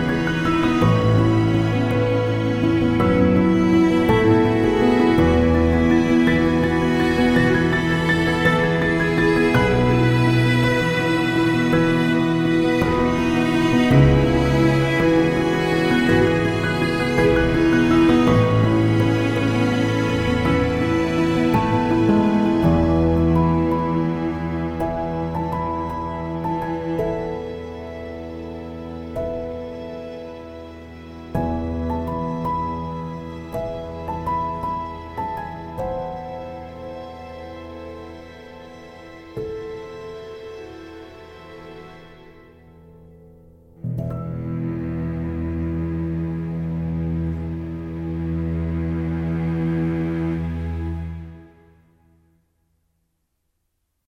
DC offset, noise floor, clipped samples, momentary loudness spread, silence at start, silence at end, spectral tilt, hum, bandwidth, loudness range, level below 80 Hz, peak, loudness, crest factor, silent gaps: under 0.1%; -73 dBFS; under 0.1%; 19 LU; 0 s; 2.65 s; -7.5 dB/octave; none; 14 kHz; 18 LU; -36 dBFS; -4 dBFS; -20 LUFS; 16 dB; none